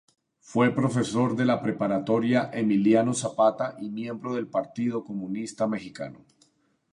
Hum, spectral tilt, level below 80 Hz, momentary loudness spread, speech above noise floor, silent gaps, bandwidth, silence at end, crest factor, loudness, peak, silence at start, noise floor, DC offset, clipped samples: none; -6 dB/octave; -68 dBFS; 11 LU; 41 dB; none; 11 kHz; 0.8 s; 18 dB; -26 LUFS; -8 dBFS; 0.5 s; -67 dBFS; under 0.1%; under 0.1%